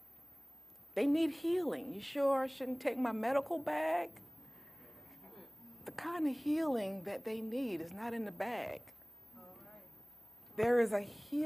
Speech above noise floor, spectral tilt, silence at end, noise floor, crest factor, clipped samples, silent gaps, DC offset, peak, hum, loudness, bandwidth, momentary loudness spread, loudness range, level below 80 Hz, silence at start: 24 dB; -5.5 dB/octave; 0 s; -59 dBFS; 20 dB; under 0.1%; none; under 0.1%; -18 dBFS; none; -36 LUFS; 15 kHz; 24 LU; 7 LU; -74 dBFS; 0 s